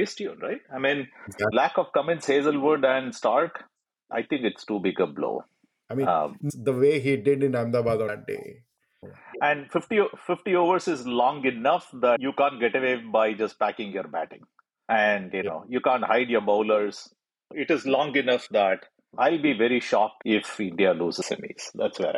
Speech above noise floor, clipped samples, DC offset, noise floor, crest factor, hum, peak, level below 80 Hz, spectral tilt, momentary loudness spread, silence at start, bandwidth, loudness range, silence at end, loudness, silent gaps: 25 dB; under 0.1%; under 0.1%; -49 dBFS; 16 dB; none; -10 dBFS; -68 dBFS; -5.5 dB/octave; 11 LU; 0 s; 12 kHz; 3 LU; 0 s; -25 LUFS; none